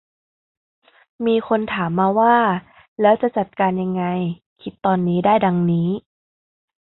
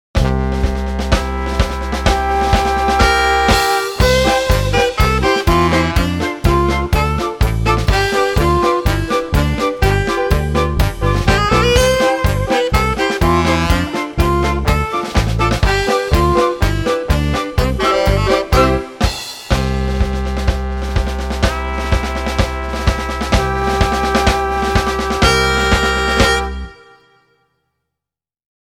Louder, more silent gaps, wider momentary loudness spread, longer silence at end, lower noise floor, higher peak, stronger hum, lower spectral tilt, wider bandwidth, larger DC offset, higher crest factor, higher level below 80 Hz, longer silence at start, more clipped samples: second, -19 LUFS vs -15 LUFS; first, 2.88-2.96 s, 4.46-4.56 s vs none; first, 11 LU vs 6 LU; second, 0.85 s vs 1.9 s; first, under -90 dBFS vs -86 dBFS; about the same, -2 dBFS vs 0 dBFS; neither; first, -12 dB/octave vs -5 dB/octave; second, 4.1 kHz vs 18.5 kHz; neither; about the same, 18 dB vs 14 dB; second, -58 dBFS vs -20 dBFS; first, 1.2 s vs 0.15 s; neither